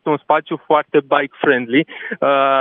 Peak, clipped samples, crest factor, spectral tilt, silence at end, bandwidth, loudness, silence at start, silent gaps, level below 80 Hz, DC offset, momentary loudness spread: 0 dBFS; under 0.1%; 16 dB; -9 dB/octave; 0 s; 4 kHz; -17 LUFS; 0.05 s; none; -78 dBFS; under 0.1%; 4 LU